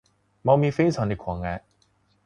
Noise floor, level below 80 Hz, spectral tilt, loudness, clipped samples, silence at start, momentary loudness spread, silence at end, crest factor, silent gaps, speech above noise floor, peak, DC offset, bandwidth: -65 dBFS; -46 dBFS; -8 dB/octave; -24 LUFS; under 0.1%; 0.45 s; 12 LU; 0.65 s; 20 dB; none; 43 dB; -6 dBFS; under 0.1%; 10 kHz